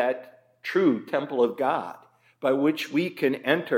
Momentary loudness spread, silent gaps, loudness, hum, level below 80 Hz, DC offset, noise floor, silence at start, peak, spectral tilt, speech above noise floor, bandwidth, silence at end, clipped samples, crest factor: 7 LU; none; -26 LUFS; none; -82 dBFS; under 0.1%; -45 dBFS; 0 s; -6 dBFS; -6 dB/octave; 20 dB; 16.5 kHz; 0 s; under 0.1%; 20 dB